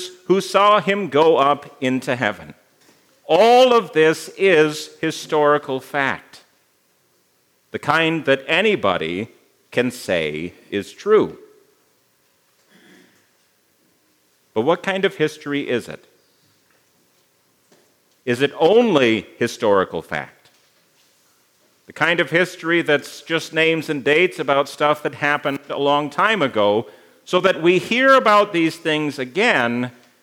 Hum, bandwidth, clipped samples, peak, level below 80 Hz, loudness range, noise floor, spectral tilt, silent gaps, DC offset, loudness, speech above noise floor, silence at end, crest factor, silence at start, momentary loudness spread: none; 16.5 kHz; under 0.1%; 0 dBFS; -68 dBFS; 8 LU; -62 dBFS; -4.5 dB/octave; none; under 0.1%; -18 LUFS; 44 dB; 0.35 s; 20 dB; 0 s; 12 LU